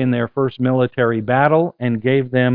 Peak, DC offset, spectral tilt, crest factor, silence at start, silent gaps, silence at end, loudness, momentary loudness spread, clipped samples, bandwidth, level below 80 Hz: 0 dBFS; under 0.1%; -11.5 dB/octave; 16 dB; 0 s; none; 0 s; -17 LUFS; 6 LU; under 0.1%; 4.6 kHz; -54 dBFS